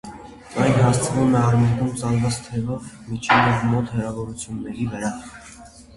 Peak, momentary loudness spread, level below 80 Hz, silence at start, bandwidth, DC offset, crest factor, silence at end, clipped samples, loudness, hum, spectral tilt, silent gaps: -2 dBFS; 17 LU; -46 dBFS; 0.05 s; 11.5 kHz; under 0.1%; 18 dB; 0.15 s; under 0.1%; -21 LUFS; none; -6 dB/octave; none